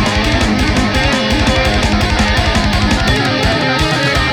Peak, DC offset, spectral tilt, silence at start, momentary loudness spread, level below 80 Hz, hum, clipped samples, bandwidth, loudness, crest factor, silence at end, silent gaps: -2 dBFS; under 0.1%; -4.5 dB/octave; 0 s; 1 LU; -20 dBFS; none; under 0.1%; 18 kHz; -13 LUFS; 12 dB; 0 s; none